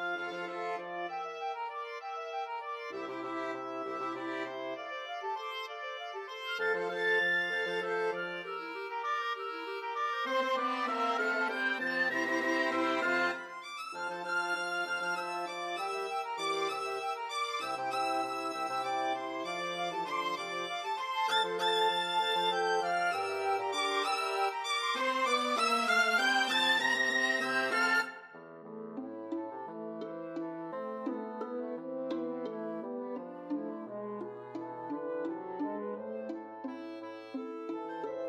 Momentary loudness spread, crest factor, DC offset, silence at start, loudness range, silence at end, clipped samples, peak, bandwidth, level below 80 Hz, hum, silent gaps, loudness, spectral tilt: 13 LU; 18 dB; under 0.1%; 0 s; 11 LU; 0 s; under 0.1%; -16 dBFS; 15 kHz; -90 dBFS; none; none; -33 LUFS; -2.5 dB/octave